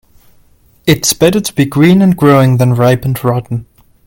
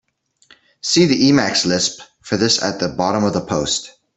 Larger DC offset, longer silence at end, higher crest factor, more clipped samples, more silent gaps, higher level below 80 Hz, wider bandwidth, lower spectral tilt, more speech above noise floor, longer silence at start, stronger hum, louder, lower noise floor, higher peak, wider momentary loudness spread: neither; first, 0.45 s vs 0.25 s; second, 10 dB vs 16 dB; neither; neither; first, -40 dBFS vs -52 dBFS; first, 17.5 kHz vs 8.4 kHz; first, -5.5 dB/octave vs -3.5 dB/octave; about the same, 38 dB vs 38 dB; about the same, 0.85 s vs 0.85 s; neither; first, -10 LUFS vs -17 LUFS; second, -47 dBFS vs -55 dBFS; about the same, 0 dBFS vs -2 dBFS; about the same, 10 LU vs 9 LU